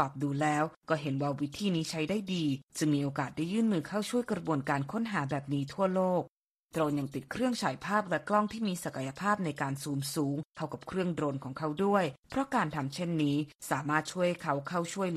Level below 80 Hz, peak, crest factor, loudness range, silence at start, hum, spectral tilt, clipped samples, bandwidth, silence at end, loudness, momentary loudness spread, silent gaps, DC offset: -66 dBFS; -14 dBFS; 18 dB; 1 LU; 0 s; none; -5.5 dB/octave; under 0.1%; 14.5 kHz; 0 s; -32 LUFS; 6 LU; 0.77-0.81 s, 2.63-2.68 s, 6.30-6.44 s, 6.51-6.69 s, 10.45-10.50 s, 12.19-12.23 s, 13.55-13.59 s; under 0.1%